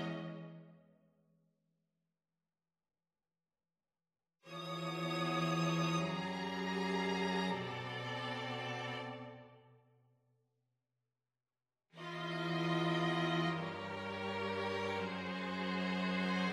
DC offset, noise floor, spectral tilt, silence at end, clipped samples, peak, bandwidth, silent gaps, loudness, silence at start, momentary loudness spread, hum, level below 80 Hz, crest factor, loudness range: under 0.1%; under -90 dBFS; -5.5 dB/octave; 0 s; under 0.1%; -24 dBFS; 13 kHz; none; -38 LUFS; 0 s; 12 LU; none; -78 dBFS; 18 dB; 14 LU